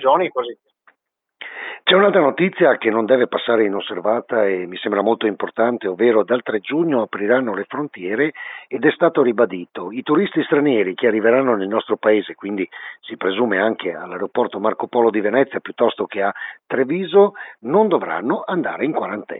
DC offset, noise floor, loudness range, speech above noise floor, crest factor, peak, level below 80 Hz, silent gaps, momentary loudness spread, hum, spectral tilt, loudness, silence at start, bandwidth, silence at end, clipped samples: under 0.1%; -71 dBFS; 3 LU; 53 dB; 18 dB; -2 dBFS; -82 dBFS; none; 11 LU; none; -10.5 dB/octave; -19 LUFS; 0 s; 4 kHz; 0 s; under 0.1%